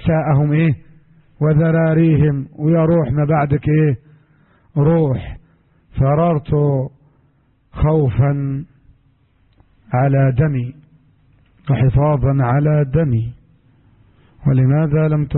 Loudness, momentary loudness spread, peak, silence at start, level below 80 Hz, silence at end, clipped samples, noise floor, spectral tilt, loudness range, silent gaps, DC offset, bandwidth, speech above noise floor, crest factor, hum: -16 LUFS; 11 LU; -4 dBFS; 0 s; -36 dBFS; 0 s; under 0.1%; -57 dBFS; -14 dB/octave; 4 LU; none; under 0.1%; 4 kHz; 42 dB; 12 dB; none